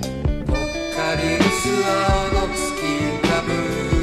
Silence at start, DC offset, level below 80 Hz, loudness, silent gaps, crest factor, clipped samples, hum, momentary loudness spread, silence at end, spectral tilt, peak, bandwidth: 0 s; under 0.1%; -28 dBFS; -21 LUFS; none; 16 dB; under 0.1%; none; 5 LU; 0 s; -4.5 dB/octave; -4 dBFS; 15.5 kHz